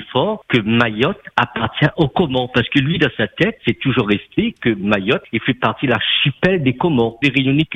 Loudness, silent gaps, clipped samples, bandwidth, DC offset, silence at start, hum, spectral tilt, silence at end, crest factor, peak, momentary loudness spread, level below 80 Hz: -17 LUFS; none; under 0.1%; 8.4 kHz; under 0.1%; 0 s; none; -7.5 dB/octave; 0 s; 16 dB; 0 dBFS; 4 LU; -46 dBFS